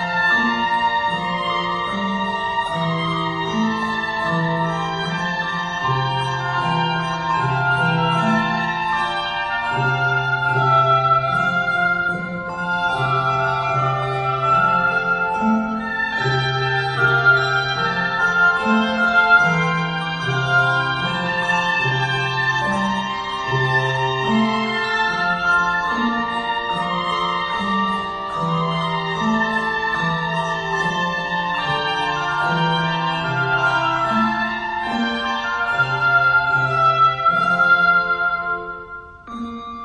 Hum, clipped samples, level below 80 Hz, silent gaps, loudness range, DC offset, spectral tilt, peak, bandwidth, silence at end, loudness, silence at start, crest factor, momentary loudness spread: none; under 0.1%; -48 dBFS; none; 5 LU; under 0.1%; -5.5 dB/octave; -2 dBFS; 10.5 kHz; 0 s; -19 LUFS; 0 s; 18 dB; 7 LU